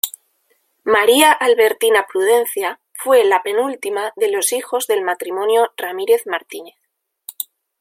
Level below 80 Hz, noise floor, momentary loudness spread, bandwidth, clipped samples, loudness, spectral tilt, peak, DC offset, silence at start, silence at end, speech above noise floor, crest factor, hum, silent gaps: -68 dBFS; -63 dBFS; 16 LU; 16.5 kHz; under 0.1%; -16 LUFS; -0.5 dB/octave; 0 dBFS; under 0.1%; 0.05 s; 0.5 s; 47 dB; 18 dB; none; none